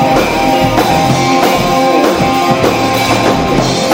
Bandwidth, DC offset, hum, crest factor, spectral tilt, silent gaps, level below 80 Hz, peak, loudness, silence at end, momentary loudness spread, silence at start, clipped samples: 16.5 kHz; under 0.1%; none; 10 dB; -4.5 dB/octave; none; -32 dBFS; 0 dBFS; -10 LUFS; 0 s; 1 LU; 0 s; under 0.1%